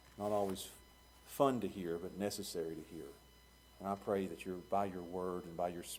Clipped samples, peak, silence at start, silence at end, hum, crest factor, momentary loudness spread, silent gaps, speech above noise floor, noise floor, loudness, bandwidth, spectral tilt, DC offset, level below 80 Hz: under 0.1%; -18 dBFS; 0.05 s; 0 s; none; 24 dB; 16 LU; none; 23 dB; -63 dBFS; -40 LUFS; over 20 kHz; -5 dB/octave; under 0.1%; -66 dBFS